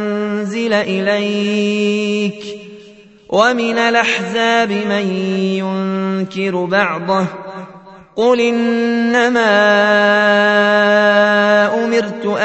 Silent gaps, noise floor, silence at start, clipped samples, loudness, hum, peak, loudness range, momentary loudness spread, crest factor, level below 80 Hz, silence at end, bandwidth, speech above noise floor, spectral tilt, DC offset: none; -42 dBFS; 0 s; under 0.1%; -14 LUFS; none; 0 dBFS; 6 LU; 8 LU; 14 dB; -62 dBFS; 0 s; 8.4 kHz; 28 dB; -5 dB/octave; under 0.1%